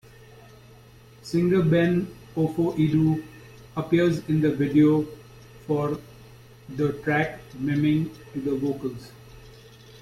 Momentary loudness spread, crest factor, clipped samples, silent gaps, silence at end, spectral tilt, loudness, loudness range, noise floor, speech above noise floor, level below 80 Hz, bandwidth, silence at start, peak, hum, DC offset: 15 LU; 16 dB; under 0.1%; none; 0.05 s; -8 dB/octave; -24 LUFS; 4 LU; -50 dBFS; 27 dB; -54 dBFS; 14.5 kHz; 1.25 s; -8 dBFS; none; under 0.1%